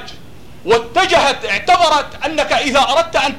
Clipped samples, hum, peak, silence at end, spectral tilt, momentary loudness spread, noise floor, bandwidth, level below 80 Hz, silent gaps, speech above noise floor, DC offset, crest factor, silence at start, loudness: under 0.1%; none; -2 dBFS; 0 s; -2.5 dB/octave; 7 LU; -39 dBFS; 15.5 kHz; -42 dBFS; none; 25 dB; 2%; 14 dB; 0 s; -14 LUFS